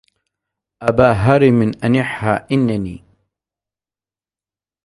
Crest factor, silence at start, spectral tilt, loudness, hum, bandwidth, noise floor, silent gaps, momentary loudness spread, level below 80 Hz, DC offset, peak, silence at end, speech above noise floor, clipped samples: 18 dB; 0.8 s; -8 dB/octave; -15 LUFS; none; 11.5 kHz; under -90 dBFS; none; 9 LU; -42 dBFS; under 0.1%; 0 dBFS; 1.9 s; over 76 dB; under 0.1%